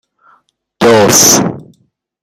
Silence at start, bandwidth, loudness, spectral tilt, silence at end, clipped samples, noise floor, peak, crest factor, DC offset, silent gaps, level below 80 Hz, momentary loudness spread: 0.8 s; over 20 kHz; -7 LUFS; -2.5 dB/octave; 0.6 s; 0.3%; -56 dBFS; 0 dBFS; 12 dB; under 0.1%; none; -48 dBFS; 9 LU